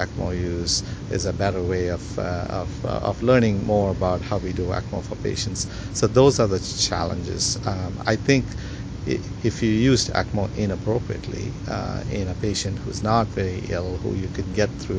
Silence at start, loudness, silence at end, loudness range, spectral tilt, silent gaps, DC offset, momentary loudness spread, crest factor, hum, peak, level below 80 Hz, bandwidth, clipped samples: 0 s; -24 LUFS; 0 s; 4 LU; -5 dB/octave; none; under 0.1%; 9 LU; 22 dB; none; -2 dBFS; -36 dBFS; 8 kHz; under 0.1%